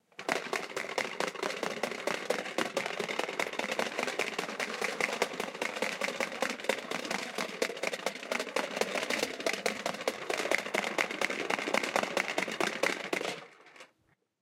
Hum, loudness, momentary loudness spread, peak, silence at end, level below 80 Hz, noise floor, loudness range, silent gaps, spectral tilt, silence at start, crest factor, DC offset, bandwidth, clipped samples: none; -33 LUFS; 5 LU; -10 dBFS; 0.55 s; -80 dBFS; -73 dBFS; 2 LU; none; -2 dB/octave; 0.2 s; 24 dB; under 0.1%; 16.5 kHz; under 0.1%